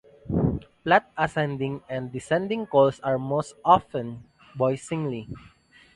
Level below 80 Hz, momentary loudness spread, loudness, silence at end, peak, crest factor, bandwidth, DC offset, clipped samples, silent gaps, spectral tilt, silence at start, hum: -48 dBFS; 14 LU; -25 LUFS; 0.6 s; -4 dBFS; 22 dB; 11.5 kHz; under 0.1%; under 0.1%; none; -6.5 dB/octave; 0.25 s; none